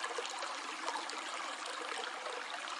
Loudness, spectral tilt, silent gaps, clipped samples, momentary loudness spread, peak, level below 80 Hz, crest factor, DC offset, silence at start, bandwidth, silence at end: -40 LUFS; 1.5 dB/octave; none; under 0.1%; 2 LU; -20 dBFS; under -90 dBFS; 22 dB; under 0.1%; 0 s; 11.5 kHz; 0 s